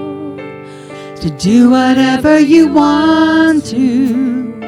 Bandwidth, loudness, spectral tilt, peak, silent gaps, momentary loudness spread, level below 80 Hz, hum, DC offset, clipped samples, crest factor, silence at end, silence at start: 12 kHz; -10 LUFS; -5.5 dB/octave; 0 dBFS; none; 20 LU; -42 dBFS; none; under 0.1%; under 0.1%; 10 dB; 0 s; 0 s